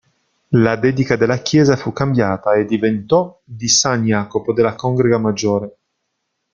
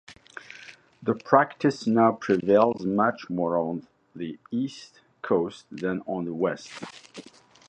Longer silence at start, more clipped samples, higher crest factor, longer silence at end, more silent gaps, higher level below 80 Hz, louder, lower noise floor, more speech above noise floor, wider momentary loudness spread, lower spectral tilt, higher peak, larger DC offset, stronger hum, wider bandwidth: first, 0.5 s vs 0.1 s; neither; second, 16 dB vs 24 dB; first, 0.85 s vs 0.45 s; neither; first, -50 dBFS vs -66 dBFS; first, -16 LUFS vs -25 LUFS; first, -73 dBFS vs -49 dBFS; first, 57 dB vs 23 dB; second, 6 LU vs 23 LU; second, -5 dB/octave vs -6.5 dB/octave; about the same, 0 dBFS vs -2 dBFS; neither; neither; about the same, 9.2 kHz vs 9.8 kHz